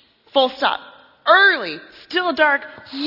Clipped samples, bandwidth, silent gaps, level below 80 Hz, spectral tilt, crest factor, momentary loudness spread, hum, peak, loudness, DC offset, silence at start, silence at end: under 0.1%; 5.8 kHz; none; -66 dBFS; -4 dB/octave; 18 dB; 17 LU; none; 0 dBFS; -17 LUFS; under 0.1%; 0.35 s; 0 s